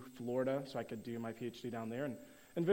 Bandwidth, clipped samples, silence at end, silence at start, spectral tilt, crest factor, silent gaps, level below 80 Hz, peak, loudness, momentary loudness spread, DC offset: 16 kHz; under 0.1%; 0 s; 0 s; -7 dB/octave; 18 dB; none; -76 dBFS; -22 dBFS; -42 LUFS; 7 LU; under 0.1%